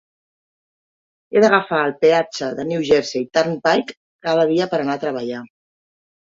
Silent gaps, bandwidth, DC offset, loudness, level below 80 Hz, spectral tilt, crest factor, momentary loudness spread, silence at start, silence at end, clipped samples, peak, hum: 3.97-4.19 s; 7.8 kHz; under 0.1%; -18 LUFS; -60 dBFS; -5 dB/octave; 18 dB; 11 LU; 1.3 s; 0.85 s; under 0.1%; -2 dBFS; none